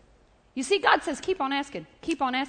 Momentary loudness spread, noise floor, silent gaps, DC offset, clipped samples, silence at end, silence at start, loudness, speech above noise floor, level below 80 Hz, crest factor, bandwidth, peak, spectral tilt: 15 LU; -60 dBFS; none; under 0.1%; under 0.1%; 0 s; 0.55 s; -26 LUFS; 33 dB; -60 dBFS; 22 dB; 9.4 kHz; -6 dBFS; -2.5 dB/octave